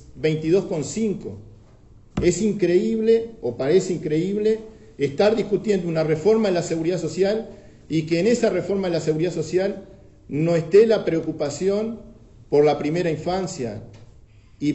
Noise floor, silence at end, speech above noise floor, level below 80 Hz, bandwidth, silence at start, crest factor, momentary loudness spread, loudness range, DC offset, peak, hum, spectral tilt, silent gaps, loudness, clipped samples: -49 dBFS; 0 s; 28 dB; -48 dBFS; 8.2 kHz; 0.1 s; 18 dB; 10 LU; 2 LU; under 0.1%; -4 dBFS; none; -6 dB/octave; none; -22 LUFS; under 0.1%